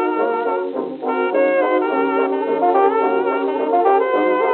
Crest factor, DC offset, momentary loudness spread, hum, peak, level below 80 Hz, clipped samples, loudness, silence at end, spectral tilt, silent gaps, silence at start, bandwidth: 14 dB; under 0.1%; 6 LU; none; -4 dBFS; -72 dBFS; under 0.1%; -18 LUFS; 0 s; -2.5 dB/octave; none; 0 s; 4.3 kHz